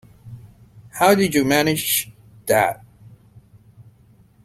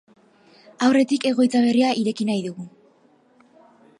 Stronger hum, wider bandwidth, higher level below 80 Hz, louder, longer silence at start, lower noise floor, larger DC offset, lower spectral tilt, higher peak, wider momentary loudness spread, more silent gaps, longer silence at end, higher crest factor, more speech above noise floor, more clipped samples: neither; first, 16.5 kHz vs 11 kHz; first, -54 dBFS vs -72 dBFS; about the same, -18 LUFS vs -20 LUFS; second, 0.25 s vs 0.8 s; second, -53 dBFS vs -58 dBFS; neither; about the same, -4 dB/octave vs -5 dB/octave; first, -2 dBFS vs -6 dBFS; first, 21 LU vs 15 LU; neither; second, 0.6 s vs 1.3 s; about the same, 20 dB vs 16 dB; about the same, 35 dB vs 38 dB; neither